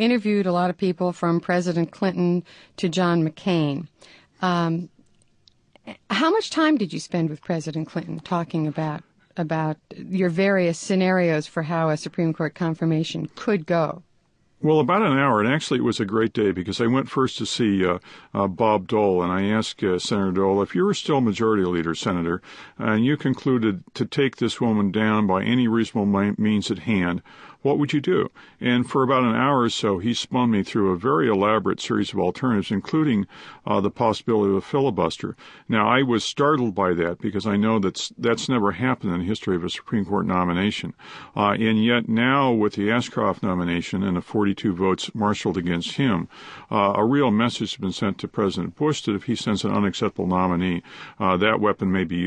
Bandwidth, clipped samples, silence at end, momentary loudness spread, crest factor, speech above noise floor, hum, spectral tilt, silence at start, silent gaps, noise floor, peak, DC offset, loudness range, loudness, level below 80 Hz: 10 kHz; under 0.1%; 0 s; 8 LU; 18 dB; 40 dB; none; -6 dB/octave; 0 s; none; -62 dBFS; -4 dBFS; under 0.1%; 3 LU; -22 LUFS; -52 dBFS